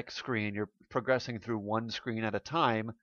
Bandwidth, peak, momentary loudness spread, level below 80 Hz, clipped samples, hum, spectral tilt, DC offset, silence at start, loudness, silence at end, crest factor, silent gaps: 7.2 kHz; -12 dBFS; 7 LU; -70 dBFS; under 0.1%; none; -6 dB/octave; under 0.1%; 0 s; -33 LUFS; 0.1 s; 20 dB; none